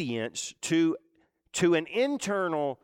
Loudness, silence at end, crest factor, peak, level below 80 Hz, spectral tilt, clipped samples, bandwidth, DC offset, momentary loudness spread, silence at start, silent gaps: -28 LUFS; 0.1 s; 14 dB; -14 dBFS; -70 dBFS; -4.5 dB/octave; under 0.1%; 15 kHz; under 0.1%; 9 LU; 0 s; none